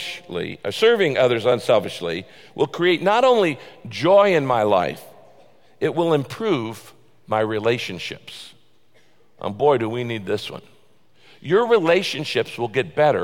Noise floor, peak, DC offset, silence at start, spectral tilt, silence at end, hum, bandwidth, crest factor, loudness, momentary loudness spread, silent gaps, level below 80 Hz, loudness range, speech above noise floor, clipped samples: -60 dBFS; -4 dBFS; 0.3%; 0 s; -5.5 dB/octave; 0 s; none; 16.5 kHz; 16 dB; -20 LUFS; 16 LU; none; -62 dBFS; 7 LU; 40 dB; under 0.1%